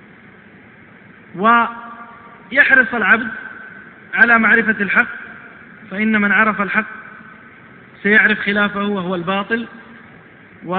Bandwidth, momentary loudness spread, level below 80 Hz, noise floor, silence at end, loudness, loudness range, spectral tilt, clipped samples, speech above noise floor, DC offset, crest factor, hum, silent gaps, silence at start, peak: 4.9 kHz; 24 LU; -58 dBFS; -43 dBFS; 0 s; -14 LUFS; 4 LU; -8.5 dB/octave; under 0.1%; 28 dB; under 0.1%; 18 dB; none; none; 1.35 s; 0 dBFS